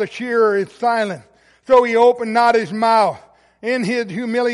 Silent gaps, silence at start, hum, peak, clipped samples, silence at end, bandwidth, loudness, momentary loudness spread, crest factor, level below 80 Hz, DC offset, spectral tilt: none; 0 s; none; -2 dBFS; under 0.1%; 0 s; 11.5 kHz; -17 LUFS; 9 LU; 14 dB; -60 dBFS; under 0.1%; -5 dB/octave